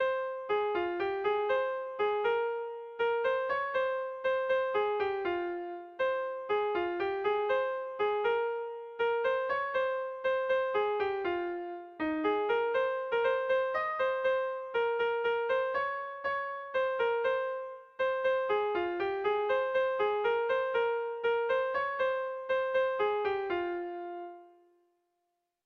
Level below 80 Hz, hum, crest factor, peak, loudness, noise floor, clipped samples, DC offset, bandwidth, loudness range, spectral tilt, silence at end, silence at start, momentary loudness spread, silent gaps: -70 dBFS; none; 12 dB; -18 dBFS; -32 LUFS; -82 dBFS; under 0.1%; under 0.1%; 6.2 kHz; 2 LU; -5.5 dB/octave; 1.2 s; 0 s; 6 LU; none